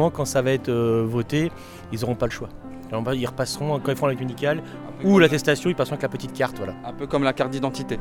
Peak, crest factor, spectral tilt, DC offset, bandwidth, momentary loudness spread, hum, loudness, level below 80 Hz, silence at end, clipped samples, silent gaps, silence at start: -2 dBFS; 20 dB; -5.5 dB/octave; under 0.1%; 18 kHz; 13 LU; none; -23 LUFS; -48 dBFS; 0 s; under 0.1%; none; 0 s